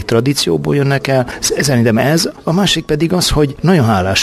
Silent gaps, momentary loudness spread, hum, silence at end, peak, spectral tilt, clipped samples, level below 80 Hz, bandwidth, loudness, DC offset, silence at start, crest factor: none; 3 LU; none; 0 s; 0 dBFS; -4.5 dB/octave; under 0.1%; -32 dBFS; 14 kHz; -13 LUFS; under 0.1%; 0 s; 12 dB